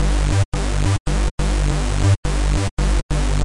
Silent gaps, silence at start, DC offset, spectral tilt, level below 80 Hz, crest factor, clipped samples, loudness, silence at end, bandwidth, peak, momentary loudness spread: 0.45-0.52 s, 1.00-1.05 s, 1.31-1.38 s, 2.17-2.23 s, 2.71-2.77 s, 3.03-3.09 s; 0 s; 2%; -5.5 dB/octave; -20 dBFS; 12 dB; under 0.1%; -20 LUFS; 0 s; 11.5 kHz; -6 dBFS; 3 LU